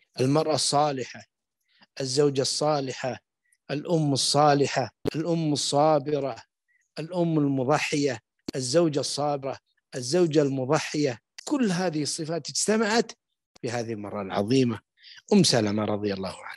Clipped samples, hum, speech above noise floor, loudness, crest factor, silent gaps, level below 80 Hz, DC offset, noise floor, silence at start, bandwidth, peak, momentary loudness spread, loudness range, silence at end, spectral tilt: under 0.1%; none; 43 dB; -25 LUFS; 18 dB; 13.46-13.55 s; -68 dBFS; under 0.1%; -68 dBFS; 0.15 s; 12.5 kHz; -8 dBFS; 13 LU; 3 LU; 0 s; -4.5 dB/octave